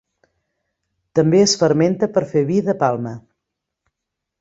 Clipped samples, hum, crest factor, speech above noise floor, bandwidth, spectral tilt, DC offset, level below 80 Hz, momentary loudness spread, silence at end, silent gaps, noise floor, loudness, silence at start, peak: under 0.1%; none; 18 dB; 65 dB; 8 kHz; -5.5 dB/octave; under 0.1%; -58 dBFS; 11 LU; 1.2 s; none; -81 dBFS; -17 LUFS; 1.15 s; -2 dBFS